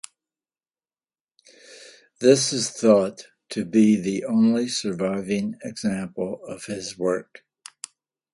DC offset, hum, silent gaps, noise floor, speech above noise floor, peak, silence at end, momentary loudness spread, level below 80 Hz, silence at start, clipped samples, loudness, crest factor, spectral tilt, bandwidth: under 0.1%; none; none; under -90 dBFS; over 68 dB; -4 dBFS; 1.1 s; 15 LU; -64 dBFS; 1.7 s; under 0.1%; -23 LUFS; 22 dB; -4.5 dB/octave; 11.5 kHz